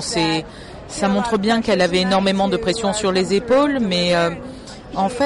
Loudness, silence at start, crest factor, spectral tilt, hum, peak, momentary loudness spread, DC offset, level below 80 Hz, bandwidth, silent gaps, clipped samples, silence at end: -18 LUFS; 0 s; 12 dB; -4.5 dB/octave; none; -8 dBFS; 15 LU; under 0.1%; -44 dBFS; 11.5 kHz; none; under 0.1%; 0 s